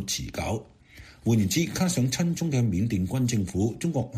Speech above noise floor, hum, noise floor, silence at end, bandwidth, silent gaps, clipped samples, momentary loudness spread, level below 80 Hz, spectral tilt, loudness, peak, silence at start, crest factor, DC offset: 24 dB; none; -50 dBFS; 0 s; 15.5 kHz; none; under 0.1%; 7 LU; -48 dBFS; -5.5 dB/octave; -26 LUFS; -12 dBFS; 0 s; 16 dB; under 0.1%